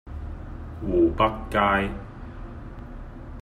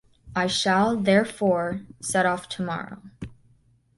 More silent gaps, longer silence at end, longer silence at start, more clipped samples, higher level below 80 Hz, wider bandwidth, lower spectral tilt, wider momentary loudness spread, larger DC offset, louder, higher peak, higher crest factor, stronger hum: neither; second, 0 s vs 0.65 s; second, 0.05 s vs 0.25 s; neither; first, -38 dBFS vs -56 dBFS; about the same, 11.5 kHz vs 12 kHz; first, -7.5 dB/octave vs -4.5 dB/octave; about the same, 20 LU vs 19 LU; neither; about the same, -23 LUFS vs -24 LUFS; about the same, -8 dBFS vs -6 dBFS; about the same, 20 dB vs 18 dB; neither